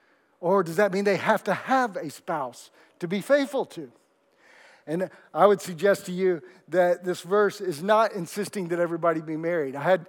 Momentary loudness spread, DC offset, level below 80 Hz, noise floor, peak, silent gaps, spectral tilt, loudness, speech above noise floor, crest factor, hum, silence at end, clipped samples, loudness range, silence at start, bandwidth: 10 LU; under 0.1%; under -90 dBFS; -62 dBFS; -4 dBFS; none; -5.5 dB/octave; -25 LUFS; 37 dB; 22 dB; none; 0.05 s; under 0.1%; 5 LU; 0.4 s; 18 kHz